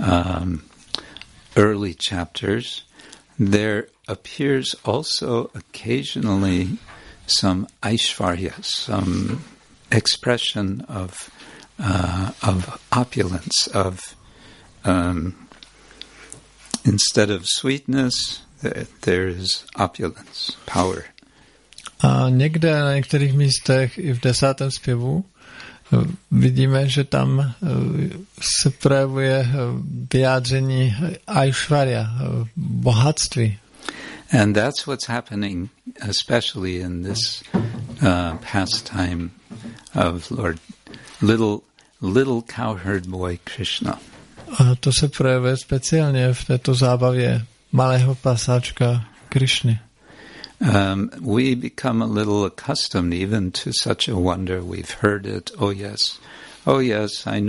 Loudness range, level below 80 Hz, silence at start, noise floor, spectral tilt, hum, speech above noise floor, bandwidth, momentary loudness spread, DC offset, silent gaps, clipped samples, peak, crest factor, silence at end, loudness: 4 LU; -46 dBFS; 0 s; -53 dBFS; -5 dB/octave; none; 33 dB; 11.5 kHz; 13 LU; under 0.1%; none; under 0.1%; 0 dBFS; 20 dB; 0 s; -21 LUFS